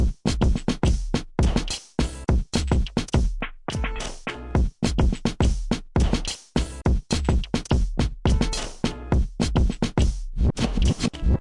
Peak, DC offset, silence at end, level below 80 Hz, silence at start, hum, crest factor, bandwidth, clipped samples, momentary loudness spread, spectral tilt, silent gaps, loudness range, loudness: -8 dBFS; under 0.1%; 0 s; -26 dBFS; 0 s; none; 14 dB; 11.5 kHz; under 0.1%; 5 LU; -5.5 dB/octave; none; 1 LU; -25 LUFS